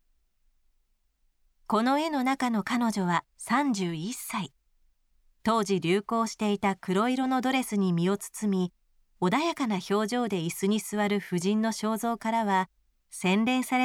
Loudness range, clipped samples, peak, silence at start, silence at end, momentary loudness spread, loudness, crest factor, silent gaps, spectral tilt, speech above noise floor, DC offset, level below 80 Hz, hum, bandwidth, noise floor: 2 LU; under 0.1%; -12 dBFS; 1.7 s; 0 s; 5 LU; -28 LUFS; 16 dB; none; -5 dB/octave; 44 dB; under 0.1%; -68 dBFS; none; 16.5 kHz; -71 dBFS